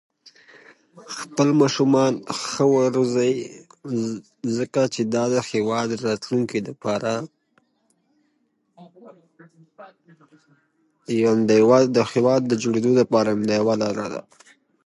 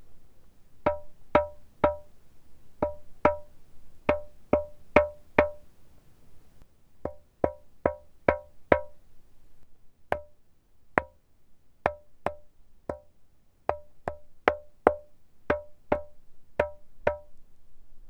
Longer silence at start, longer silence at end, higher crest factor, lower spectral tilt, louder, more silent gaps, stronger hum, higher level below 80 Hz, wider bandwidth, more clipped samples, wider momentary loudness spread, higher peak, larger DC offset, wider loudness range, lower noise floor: first, 0.95 s vs 0 s; first, 0.65 s vs 0 s; second, 20 dB vs 32 dB; second, -5.5 dB/octave vs -7.5 dB/octave; first, -21 LUFS vs -30 LUFS; neither; neither; second, -66 dBFS vs -50 dBFS; first, 11.5 kHz vs 10 kHz; neither; about the same, 12 LU vs 14 LU; second, -4 dBFS vs 0 dBFS; neither; first, 10 LU vs 7 LU; first, -69 dBFS vs -56 dBFS